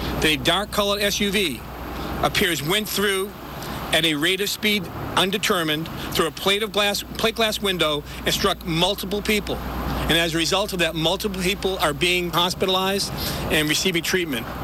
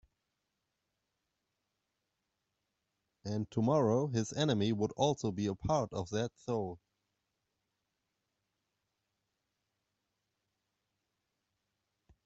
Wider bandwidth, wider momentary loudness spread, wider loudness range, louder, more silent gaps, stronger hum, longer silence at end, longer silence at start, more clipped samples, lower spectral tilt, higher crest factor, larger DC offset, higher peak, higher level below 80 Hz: first, over 20 kHz vs 8 kHz; second, 6 LU vs 10 LU; second, 1 LU vs 13 LU; first, -21 LUFS vs -34 LUFS; neither; neither; second, 0 s vs 5.5 s; second, 0 s vs 3.25 s; neither; second, -3 dB/octave vs -6.5 dB/octave; second, 14 dB vs 22 dB; neither; first, -8 dBFS vs -16 dBFS; first, -38 dBFS vs -66 dBFS